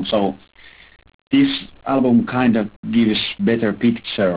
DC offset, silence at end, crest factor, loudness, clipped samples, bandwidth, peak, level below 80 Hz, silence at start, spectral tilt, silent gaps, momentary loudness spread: 0.1%; 0 s; 14 dB; -18 LUFS; under 0.1%; 4 kHz; -6 dBFS; -52 dBFS; 0 s; -10.5 dB/octave; 1.14-1.27 s, 2.76-2.83 s; 6 LU